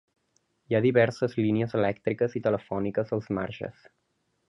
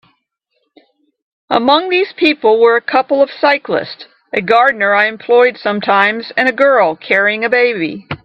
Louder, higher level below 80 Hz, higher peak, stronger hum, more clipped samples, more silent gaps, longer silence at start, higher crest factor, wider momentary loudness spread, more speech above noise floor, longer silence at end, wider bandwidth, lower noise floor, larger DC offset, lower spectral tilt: second, -27 LUFS vs -12 LUFS; about the same, -60 dBFS vs -60 dBFS; second, -8 dBFS vs 0 dBFS; neither; neither; neither; second, 0.7 s vs 1.5 s; first, 20 dB vs 14 dB; about the same, 9 LU vs 9 LU; second, 46 dB vs 55 dB; first, 0.8 s vs 0.1 s; first, 10.5 kHz vs 6.8 kHz; first, -72 dBFS vs -67 dBFS; neither; first, -8 dB/octave vs -6 dB/octave